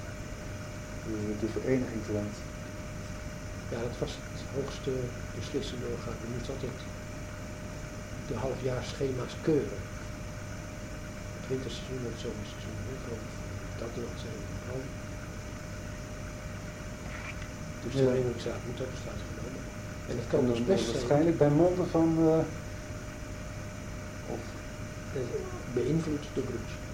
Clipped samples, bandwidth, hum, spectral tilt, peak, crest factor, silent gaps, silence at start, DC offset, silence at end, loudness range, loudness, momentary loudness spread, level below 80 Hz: under 0.1%; 16.5 kHz; none; -6 dB/octave; -12 dBFS; 22 dB; none; 0 s; under 0.1%; 0 s; 11 LU; -34 LUFS; 14 LU; -46 dBFS